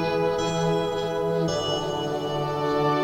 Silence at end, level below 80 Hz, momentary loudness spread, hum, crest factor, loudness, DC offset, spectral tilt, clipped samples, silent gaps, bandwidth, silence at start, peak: 0 s; -50 dBFS; 3 LU; none; 12 dB; -25 LUFS; under 0.1%; -5.5 dB/octave; under 0.1%; none; 16 kHz; 0 s; -12 dBFS